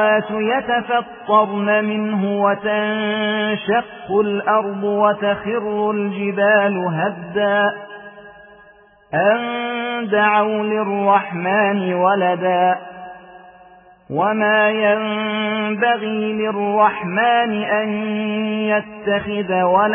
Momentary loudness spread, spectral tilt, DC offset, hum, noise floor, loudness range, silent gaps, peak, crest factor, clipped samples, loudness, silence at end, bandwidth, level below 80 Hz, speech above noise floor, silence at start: 6 LU; -9.5 dB/octave; under 0.1%; none; -49 dBFS; 2 LU; none; -2 dBFS; 16 dB; under 0.1%; -18 LUFS; 0 s; 3.6 kHz; -60 dBFS; 31 dB; 0 s